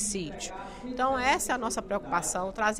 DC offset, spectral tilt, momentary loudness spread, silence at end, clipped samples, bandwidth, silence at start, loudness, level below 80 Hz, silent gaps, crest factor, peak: under 0.1%; -2.5 dB/octave; 12 LU; 0 s; under 0.1%; 16 kHz; 0 s; -29 LUFS; -50 dBFS; none; 18 dB; -12 dBFS